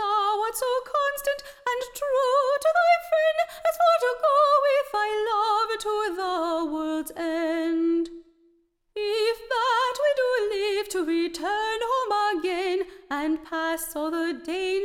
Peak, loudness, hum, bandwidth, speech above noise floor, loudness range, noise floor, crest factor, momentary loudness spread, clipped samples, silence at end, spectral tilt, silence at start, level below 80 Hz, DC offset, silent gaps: -10 dBFS; -25 LUFS; none; 17.5 kHz; 40 dB; 5 LU; -65 dBFS; 16 dB; 8 LU; under 0.1%; 0 s; -1.5 dB/octave; 0 s; -60 dBFS; under 0.1%; none